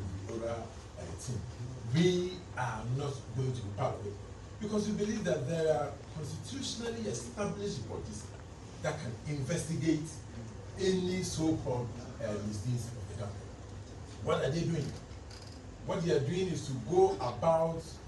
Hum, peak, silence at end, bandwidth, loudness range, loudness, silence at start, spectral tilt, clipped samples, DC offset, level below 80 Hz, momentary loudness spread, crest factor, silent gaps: none; -14 dBFS; 0 s; 12 kHz; 5 LU; -35 LUFS; 0 s; -6 dB/octave; under 0.1%; under 0.1%; -54 dBFS; 16 LU; 20 dB; none